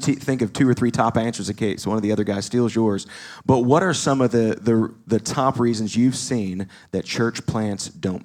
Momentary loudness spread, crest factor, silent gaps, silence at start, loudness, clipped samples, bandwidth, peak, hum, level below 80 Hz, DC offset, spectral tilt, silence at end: 8 LU; 18 dB; none; 0 s; -21 LUFS; under 0.1%; 14.5 kHz; -2 dBFS; none; -56 dBFS; under 0.1%; -5.5 dB/octave; 0.05 s